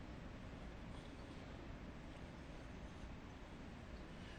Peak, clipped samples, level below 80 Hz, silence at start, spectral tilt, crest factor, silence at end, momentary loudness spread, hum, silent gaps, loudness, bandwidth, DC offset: -40 dBFS; under 0.1%; -58 dBFS; 0 s; -6 dB/octave; 12 dB; 0 s; 1 LU; none; none; -55 LUFS; 10 kHz; under 0.1%